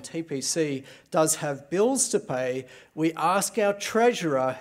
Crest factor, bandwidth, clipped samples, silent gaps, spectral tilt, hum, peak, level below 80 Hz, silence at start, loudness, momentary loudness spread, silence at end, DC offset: 16 dB; 16 kHz; under 0.1%; none; -3.5 dB/octave; none; -10 dBFS; -74 dBFS; 0 s; -25 LUFS; 8 LU; 0 s; under 0.1%